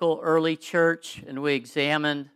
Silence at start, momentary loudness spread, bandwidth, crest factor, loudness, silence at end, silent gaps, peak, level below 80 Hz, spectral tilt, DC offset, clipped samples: 0 s; 7 LU; 13.5 kHz; 16 dB; -25 LUFS; 0.1 s; none; -8 dBFS; -74 dBFS; -5 dB/octave; under 0.1%; under 0.1%